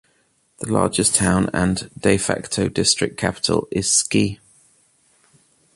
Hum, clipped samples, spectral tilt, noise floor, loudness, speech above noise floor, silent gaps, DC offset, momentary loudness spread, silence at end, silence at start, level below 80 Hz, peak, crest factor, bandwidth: none; under 0.1%; -3.5 dB/octave; -63 dBFS; -19 LUFS; 43 dB; none; under 0.1%; 6 LU; 1.4 s; 0.6 s; -44 dBFS; -2 dBFS; 20 dB; 11.5 kHz